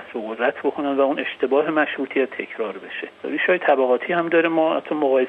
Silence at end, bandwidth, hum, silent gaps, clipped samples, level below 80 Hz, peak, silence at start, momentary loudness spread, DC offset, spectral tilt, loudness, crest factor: 0 s; 4.6 kHz; none; none; under 0.1%; -72 dBFS; -4 dBFS; 0 s; 11 LU; under 0.1%; -7 dB/octave; -21 LUFS; 16 dB